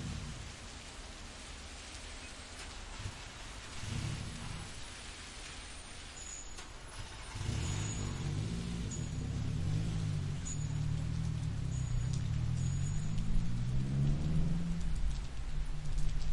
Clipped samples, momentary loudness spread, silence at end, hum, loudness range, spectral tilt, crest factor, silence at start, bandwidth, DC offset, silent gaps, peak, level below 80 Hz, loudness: under 0.1%; 11 LU; 0 s; none; 9 LU; -5 dB/octave; 16 dB; 0 s; 11.5 kHz; under 0.1%; none; -20 dBFS; -42 dBFS; -40 LUFS